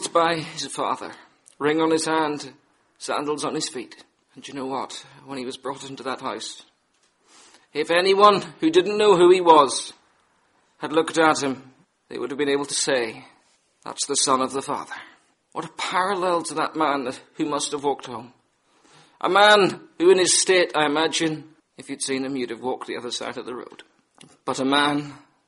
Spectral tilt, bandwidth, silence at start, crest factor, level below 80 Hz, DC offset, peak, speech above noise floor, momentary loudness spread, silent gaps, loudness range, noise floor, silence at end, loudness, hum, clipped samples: -3 dB/octave; 11.5 kHz; 0 s; 22 dB; -70 dBFS; under 0.1%; 0 dBFS; 44 dB; 21 LU; none; 12 LU; -66 dBFS; 0.3 s; -21 LUFS; none; under 0.1%